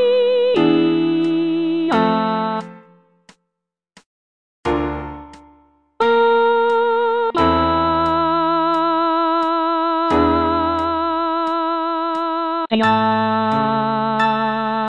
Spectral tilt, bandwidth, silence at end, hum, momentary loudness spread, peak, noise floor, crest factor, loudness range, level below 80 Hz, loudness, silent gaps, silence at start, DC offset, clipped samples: -7 dB/octave; 9 kHz; 0 s; none; 6 LU; -2 dBFS; -80 dBFS; 14 dB; 8 LU; -42 dBFS; -17 LUFS; 4.06-4.63 s; 0 s; 0.3%; under 0.1%